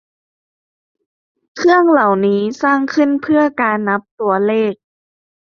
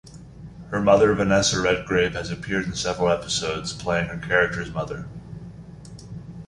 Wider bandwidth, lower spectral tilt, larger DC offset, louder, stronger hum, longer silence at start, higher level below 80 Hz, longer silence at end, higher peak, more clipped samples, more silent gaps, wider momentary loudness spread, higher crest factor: second, 7.2 kHz vs 11.5 kHz; first, -6.5 dB/octave vs -4 dB/octave; neither; first, -14 LUFS vs -22 LUFS; neither; first, 1.55 s vs 0.05 s; second, -62 dBFS vs -44 dBFS; first, 0.7 s vs 0 s; first, -2 dBFS vs -6 dBFS; neither; first, 4.11-4.18 s vs none; second, 7 LU vs 23 LU; about the same, 14 dB vs 18 dB